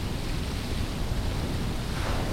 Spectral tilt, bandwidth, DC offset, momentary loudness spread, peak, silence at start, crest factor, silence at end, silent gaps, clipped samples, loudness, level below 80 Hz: -5.5 dB/octave; 16.5 kHz; under 0.1%; 2 LU; -16 dBFS; 0 s; 12 dB; 0 s; none; under 0.1%; -31 LUFS; -32 dBFS